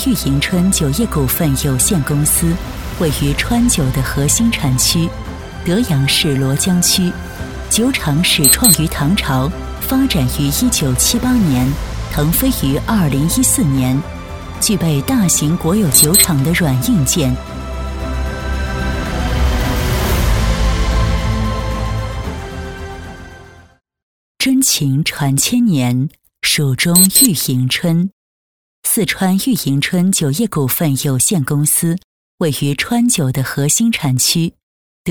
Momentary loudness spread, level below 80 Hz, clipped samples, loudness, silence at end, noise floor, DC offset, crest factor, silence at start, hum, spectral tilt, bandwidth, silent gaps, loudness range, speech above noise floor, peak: 11 LU; -26 dBFS; under 0.1%; -14 LUFS; 0 s; -39 dBFS; 0.3%; 14 dB; 0 s; none; -4 dB/octave; over 20 kHz; 24.03-24.35 s, 28.13-28.83 s, 32.04-32.38 s, 34.63-35.05 s; 6 LU; 25 dB; 0 dBFS